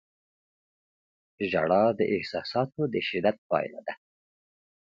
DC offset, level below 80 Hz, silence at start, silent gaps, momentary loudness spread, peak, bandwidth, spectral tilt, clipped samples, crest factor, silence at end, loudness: under 0.1%; -66 dBFS; 1.4 s; 3.38-3.50 s; 13 LU; -10 dBFS; 7.4 kHz; -7.5 dB/octave; under 0.1%; 20 dB; 1 s; -27 LUFS